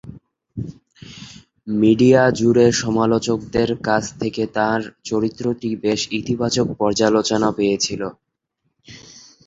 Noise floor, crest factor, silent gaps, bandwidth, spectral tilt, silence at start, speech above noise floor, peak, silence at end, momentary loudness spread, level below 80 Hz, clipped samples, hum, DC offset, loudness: -73 dBFS; 18 dB; none; 8 kHz; -5 dB/octave; 0.05 s; 55 dB; -2 dBFS; 0.25 s; 18 LU; -50 dBFS; under 0.1%; none; under 0.1%; -18 LUFS